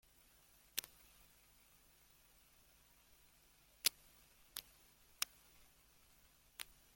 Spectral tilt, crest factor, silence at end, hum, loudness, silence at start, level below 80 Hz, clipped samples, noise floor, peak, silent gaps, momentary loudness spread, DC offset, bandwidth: 1.5 dB/octave; 36 dB; 0.35 s; none; -44 LUFS; 0.75 s; -76 dBFS; under 0.1%; -70 dBFS; -18 dBFS; none; 28 LU; under 0.1%; 17 kHz